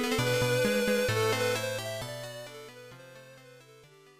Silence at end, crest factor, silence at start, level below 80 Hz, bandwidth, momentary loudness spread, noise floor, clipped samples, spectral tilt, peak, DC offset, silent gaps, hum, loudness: 0.3 s; 14 dB; 0 s; -58 dBFS; 15.5 kHz; 22 LU; -56 dBFS; under 0.1%; -4 dB/octave; -18 dBFS; under 0.1%; none; none; -29 LUFS